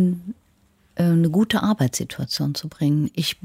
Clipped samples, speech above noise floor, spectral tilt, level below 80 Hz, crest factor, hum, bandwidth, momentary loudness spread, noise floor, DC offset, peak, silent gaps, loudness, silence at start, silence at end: under 0.1%; 39 dB; -5.5 dB/octave; -56 dBFS; 14 dB; none; 16 kHz; 13 LU; -60 dBFS; under 0.1%; -8 dBFS; none; -22 LUFS; 0 s; 0.1 s